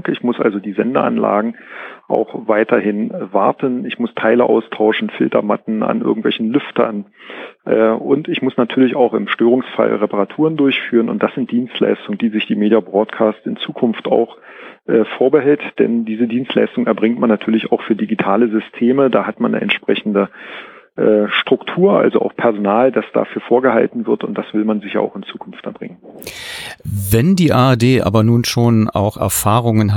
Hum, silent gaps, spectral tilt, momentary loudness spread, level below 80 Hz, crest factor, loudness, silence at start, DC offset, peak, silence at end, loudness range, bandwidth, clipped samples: none; none; -6 dB/octave; 12 LU; -48 dBFS; 16 dB; -15 LUFS; 0.05 s; under 0.1%; 0 dBFS; 0 s; 3 LU; 17.5 kHz; under 0.1%